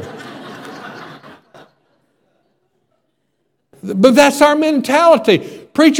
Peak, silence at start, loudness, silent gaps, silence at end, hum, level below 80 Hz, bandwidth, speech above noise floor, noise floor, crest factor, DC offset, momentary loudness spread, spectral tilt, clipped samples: 0 dBFS; 0 s; -12 LUFS; none; 0 s; none; -58 dBFS; 18 kHz; 57 dB; -68 dBFS; 16 dB; under 0.1%; 23 LU; -4.5 dB/octave; 0.1%